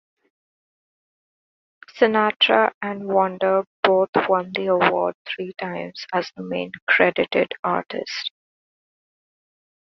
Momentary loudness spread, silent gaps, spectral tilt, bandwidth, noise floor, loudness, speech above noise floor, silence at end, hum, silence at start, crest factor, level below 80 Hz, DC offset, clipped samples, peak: 12 LU; 2.36-2.40 s, 2.74-2.81 s, 3.67-3.83 s, 4.09-4.13 s, 5.15-5.25 s, 6.82-6.87 s, 7.59-7.63 s; -5 dB/octave; 6.4 kHz; under -90 dBFS; -21 LUFS; over 69 dB; 1.65 s; none; 1.95 s; 22 dB; -66 dBFS; under 0.1%; under 0.1%; -2 dBFS